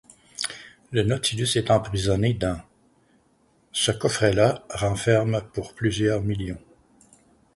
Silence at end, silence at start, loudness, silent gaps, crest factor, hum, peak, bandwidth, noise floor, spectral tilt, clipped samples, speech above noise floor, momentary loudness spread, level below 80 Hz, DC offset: 1 s; 0.4 s; -24 LUFS; none; 20 dB; none; -4 dBFS; 11.5 kHz; -63 dBFS; -5 dB/octave; under 0.1%; 40 dB; 11 LU; -46 dBFS; under 0.1%